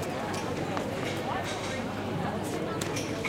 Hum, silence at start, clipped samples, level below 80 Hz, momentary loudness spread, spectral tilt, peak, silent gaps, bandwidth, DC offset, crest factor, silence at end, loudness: none; 0 s; under 0.1%; -56 dBFS; 1 LU; -5 dB/octave; -14 dBFS; none; 17 kHz; under 0.1%; 18 dB; 0 s; -32 LUFS